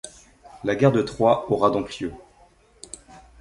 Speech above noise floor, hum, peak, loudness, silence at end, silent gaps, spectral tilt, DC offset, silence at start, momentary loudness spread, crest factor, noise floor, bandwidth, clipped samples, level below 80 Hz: 35 dB; none; -4 dBFS; -22 LUFS; 0.2 s; none; -6.5 dB/octave; under 0.1%; 0.05 s; 21 LU; 20 dB; -56 dBFS; 11.5 kHz; under 0.1%; -52 dBFS